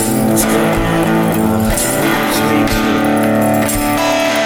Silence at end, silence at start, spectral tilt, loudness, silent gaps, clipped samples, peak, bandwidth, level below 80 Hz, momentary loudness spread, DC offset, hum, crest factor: 0 s; 0 s; -4.5 dB/octave; -13 LUFS; none; under 0.1%; 0 dBFS; 18 kHz; -30 dBFS; 1 LU; under 0.1%; none; 12 dB